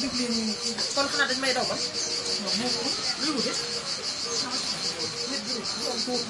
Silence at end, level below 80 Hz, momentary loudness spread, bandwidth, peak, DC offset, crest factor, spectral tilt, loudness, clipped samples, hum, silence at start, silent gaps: 0 s; -62 dBFS; 5 LU; 11.5 kHz; -12 dBFS; under 0.1%; 18 dB; -1.5 dB/octave; -26 LUFS; under 0.1%; none; 0 s; none